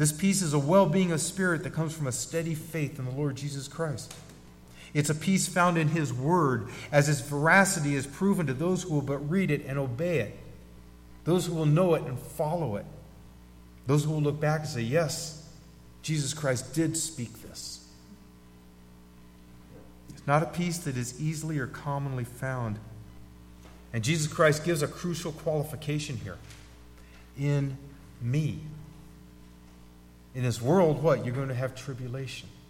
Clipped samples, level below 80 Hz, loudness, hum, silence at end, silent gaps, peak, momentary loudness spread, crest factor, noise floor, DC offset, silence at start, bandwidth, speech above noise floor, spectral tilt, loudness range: under 0.1%; -54 dBFS; -28 LUFS; 60 Hz at -50 dBFS; 0.1 s; none; -6 dBFS; 16 LU; 22 dB; -52 dBFS; under 0.1%; 0 s; 16.5 kHz; 25 dB; -5.5 dB/octave; 9 LU